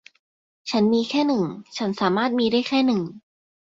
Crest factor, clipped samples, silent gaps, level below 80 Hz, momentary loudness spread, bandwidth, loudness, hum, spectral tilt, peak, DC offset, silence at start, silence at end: 16 dB; under 0.1%; none; -64 dBFS; 9 LU; 7.8 kHz; -22 LUFS; none; -5.5 dB/octave; -8 dBFS; under 0.1%; 0.65 s; 0.6 s